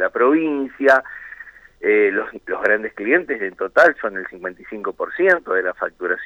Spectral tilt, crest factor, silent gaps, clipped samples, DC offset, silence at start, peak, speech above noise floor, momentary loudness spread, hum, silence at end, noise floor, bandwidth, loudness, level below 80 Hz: -5.5 dB/octave; 16 dB; none; under 0.1%; under 0.1%; 0 s; -2 dBFS; 22 dB; 15 LU; none; 0 s; -41 dBFS; 8.6 kHz; -19 LUFS; -60 dBFS